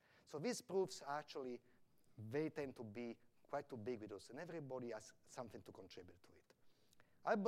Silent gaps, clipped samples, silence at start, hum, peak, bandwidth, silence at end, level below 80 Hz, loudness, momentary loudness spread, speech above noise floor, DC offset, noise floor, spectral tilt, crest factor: none; under 0.1%; 0.15 s; none; -26 dBFS; 15.5 kHz; 0 s; -86 dBFS; -49 LUFS; 15 LU; 23 dB; under 0.1%; -71 dBFS; -5 dB/octave; 24 dB